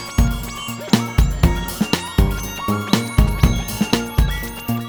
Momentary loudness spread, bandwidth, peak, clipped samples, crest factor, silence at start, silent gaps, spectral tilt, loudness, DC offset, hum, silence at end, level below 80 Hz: 7 LU; over 20 kHz; 0 dBFS; under 0.1%; 18 dB; 0 s; none; -5 dB/octave; -20 LUFS; under 0.1%; none; 0 s; -22 dBFS